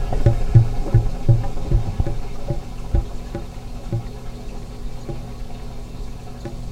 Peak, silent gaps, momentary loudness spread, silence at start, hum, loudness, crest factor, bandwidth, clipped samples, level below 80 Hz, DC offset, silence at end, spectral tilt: 0 dBFS; none; 18 LU; 0 s; none; -23 LUFS; 20 dB; 9.8 kHz; under 0.1%; -24 dBFS; under 0.1%; 0 s; -8 dB/octave